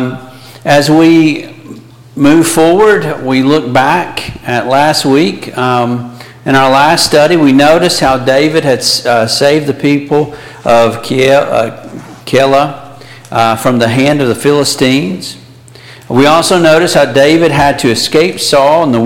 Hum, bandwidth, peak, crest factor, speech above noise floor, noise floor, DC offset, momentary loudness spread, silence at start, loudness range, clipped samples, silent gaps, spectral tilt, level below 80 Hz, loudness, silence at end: none; 17 kHz; 0 dBFS; 10 dB; 26 dB; -34 dBFS; under 0.1%; 12 LU; 0 s; 3 LU; under 0.1%; none; -4.5 dB/octave; -42 dBFS; -9 LUFS; 0 s